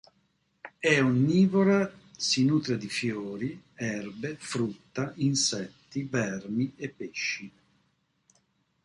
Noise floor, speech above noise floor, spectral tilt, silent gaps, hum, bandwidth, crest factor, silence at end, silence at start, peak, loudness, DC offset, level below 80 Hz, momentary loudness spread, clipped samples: -72 dBFS; 45 dB; -4.5 dB/octave; none; none; 11.5 kHz; 20 dB; 1.35 s; 0.65 s; -8 dBFS; -28 LUFS; under 0.1%; -66 dBFS; 14 LU; under 0.1%